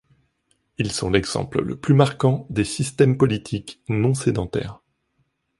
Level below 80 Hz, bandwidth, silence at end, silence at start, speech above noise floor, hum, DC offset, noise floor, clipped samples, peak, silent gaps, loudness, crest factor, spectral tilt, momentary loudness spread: -46 dBFS; 11.5 kHz; 0.85 s; 0.8 s; 49 dB; none; under 0.1%; -70 dBFS; under 0.1%; -4 dBFS; none; -22 LUFS; 18 dB; -6 dB/octave; 11 LU